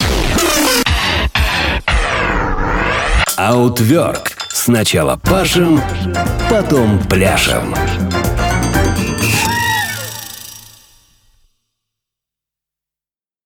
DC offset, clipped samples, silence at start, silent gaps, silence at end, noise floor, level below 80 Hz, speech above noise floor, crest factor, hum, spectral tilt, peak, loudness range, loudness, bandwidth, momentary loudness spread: under 0.1%; under 0.1%; 0 s; none; 2.85 s; under -90 dBFS; -24 dBFS; over 77 dB; 14 dB; none; -4 dB/octave; -2 dBFS; 6 LU; -14 LUFS; over 20 kHz; 6 LU